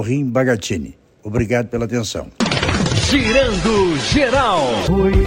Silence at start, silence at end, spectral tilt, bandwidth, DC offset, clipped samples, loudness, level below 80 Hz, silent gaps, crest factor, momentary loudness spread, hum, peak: 0 s; 0 s; -5 dB/octave; 16 kHz; under 0.1%; under 0.1%; -17 LUFS; -28 dBFS; none; 16 dB; 10 LU; none; 0 dBFS